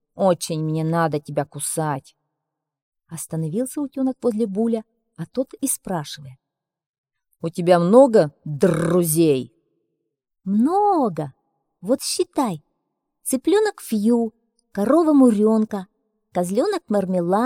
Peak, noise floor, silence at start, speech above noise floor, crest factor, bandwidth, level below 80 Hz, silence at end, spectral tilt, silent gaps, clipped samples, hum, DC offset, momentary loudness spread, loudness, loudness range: -2 dBFS; -82 dBFS; 0.15 s; 62 dB; 20 dB; 16.5 kHz; -62 dBFS; 0 s; -6 dB/octave; 2.82-2.92 s, 6.86-7.04 s; under 0.1%; none; under 0.1%; 16 LU; -20 LUFS; 8 LU